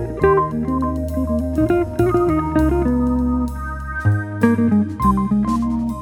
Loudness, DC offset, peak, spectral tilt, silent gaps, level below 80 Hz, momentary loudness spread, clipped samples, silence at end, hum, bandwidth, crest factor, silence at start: -19 LUFS; under 0.1%; 0 dBFS; -9 dB/octave; none; -28 dBFS; 5 LU; under 0.1%; 0 s; none; 17.5 kHz; 16 dB; 0 s